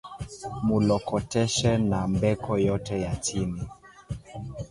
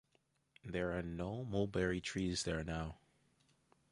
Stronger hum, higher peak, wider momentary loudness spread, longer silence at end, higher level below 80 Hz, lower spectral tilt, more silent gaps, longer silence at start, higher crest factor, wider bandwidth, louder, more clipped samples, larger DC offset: neither; first, -10 dBFS vs -22 dBFS; first, 16 LU vs 8 LU; second, 0.05 s vs 0.95 s; first, -44 dBFS vs -56 dBFS; about the same, -5.5 dB/octave vs -5 dB/octave; neither; second, 0.05 s vs 0.65 s; about the same, 16 dB vs 20 dB; about the same, 11.5 kHz vs 11.5 kHz; first, -26 LUFS vs -40 LUFS; neither; neither